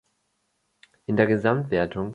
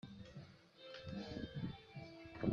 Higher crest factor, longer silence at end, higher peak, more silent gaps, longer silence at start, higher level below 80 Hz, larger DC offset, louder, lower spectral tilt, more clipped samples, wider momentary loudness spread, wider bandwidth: about the same, 20 dB vs 24 dB; about the same, 0 s vs 0 s; first, -6 dBFS vs -22 dBFS; neither; first, 1.1 s vs 0.05 s; first, -54 dBFS vs -66 dBFS; neither; first, -23 LUFS vs -50 LUFS; about the same, -8.5 dB/octave vs -7.5 dB/octave; neither; second, 7 LU vs 12 LU; first, 8.4 kHz vs 7.4 kHz